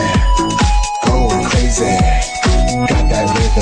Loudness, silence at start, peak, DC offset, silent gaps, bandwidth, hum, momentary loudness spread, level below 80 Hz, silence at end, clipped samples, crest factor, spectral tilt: -14 LUFS; 0 s; -2 dBFS; under 0.1%; none; 10 kHz; none; 2 LU; -16 dBFS; 0 s; under 0.1%; 12 dB; -4.5 dB/octave